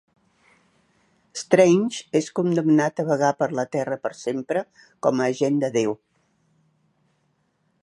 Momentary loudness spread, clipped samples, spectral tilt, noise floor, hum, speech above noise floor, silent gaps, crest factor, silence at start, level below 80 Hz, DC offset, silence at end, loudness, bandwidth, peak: 11 LU; under 0.1%; -6 dB/octave; -69 dBFS; none; 47 dB; none; 22 dB; 1.35 s; -72 dBFS; under 0.1%; 1.85 s; -22 LUFS; 11.5 kHz; -2 dBFS